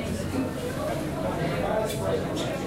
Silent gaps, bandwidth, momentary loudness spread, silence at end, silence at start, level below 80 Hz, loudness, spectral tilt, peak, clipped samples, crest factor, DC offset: none; 16 kHz; 3 LU; 0 s; 0 s; -44 dBFS; -29 LUFS; -5.5 dB/octave; -14 dBFS; under 0.1%; 14 dB; 0.1%